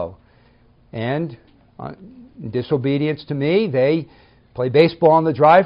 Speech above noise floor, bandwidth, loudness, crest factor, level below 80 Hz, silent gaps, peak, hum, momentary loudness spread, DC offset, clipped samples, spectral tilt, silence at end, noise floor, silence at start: 36 dB; 5.4 kHz; -18 LUFS; 16 dB; -56 dBFS; none; -2 dBFS; none; 21 LU; under 0.1%; under 0.1%; -5.5 dB/octave; 0 s; -53 dBFS; 0 s